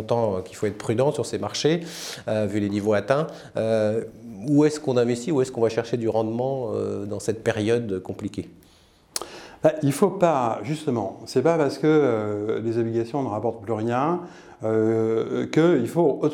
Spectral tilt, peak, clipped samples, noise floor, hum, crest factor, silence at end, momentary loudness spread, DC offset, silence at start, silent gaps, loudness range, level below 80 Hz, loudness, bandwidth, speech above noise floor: -6 dB/octave; -4 dBFS; under 0.1%; -55 dBFS; none; 18 dB; 0 s; 11 LU; under 0.1%; 0 s; none; 4 LU; -62 dBFS; -24 LUFS; 17.5 kHz; 32 dB